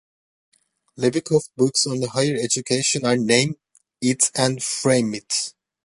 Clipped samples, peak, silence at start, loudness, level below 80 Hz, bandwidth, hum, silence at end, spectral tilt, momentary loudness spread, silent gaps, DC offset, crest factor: under 0.1%; -2 dBFS; 0.95 s; -21 LUFS; -62 dBFS; 11.5 kHz; none; 0.35 s; -3.5 dB/octave; 6 LU; none; under 0.1%; 20 dB